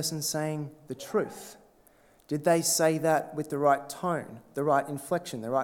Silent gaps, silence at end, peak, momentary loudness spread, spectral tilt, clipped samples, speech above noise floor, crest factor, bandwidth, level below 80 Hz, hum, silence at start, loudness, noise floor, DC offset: none; 0 s; -10 dBFS; 14 LU; -4 dB/octave; under 0.1%; 32 dB; 20 dB; 19 kHz; -72 dBFS; none; 0 s; -28 LUFS; -61 dBFS; under 0.1%